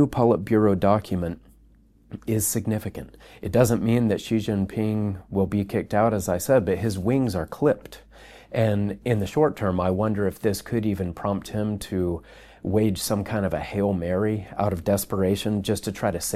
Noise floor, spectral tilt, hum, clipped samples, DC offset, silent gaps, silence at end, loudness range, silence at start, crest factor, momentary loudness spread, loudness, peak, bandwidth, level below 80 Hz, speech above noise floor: -55 dBFS; -6 dB/octave; none; under 0.1%; under 0.1%; none; 0 s; 3 LU; 0 s; 20 dB; 8 LU; -24 LUFS; -4 dBFS; 15.5 kHz; -48 dBFS; 32 dB